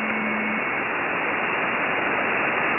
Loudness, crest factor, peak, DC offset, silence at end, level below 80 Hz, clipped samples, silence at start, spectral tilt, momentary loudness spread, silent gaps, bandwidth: -23 LUFS; 14 dB; -10 dBFS; under 0.1%; 0 s; -60 dBFS; under 0.1%; 0 s; -2 dB/octave; 2 LU; none; 3.7 kHz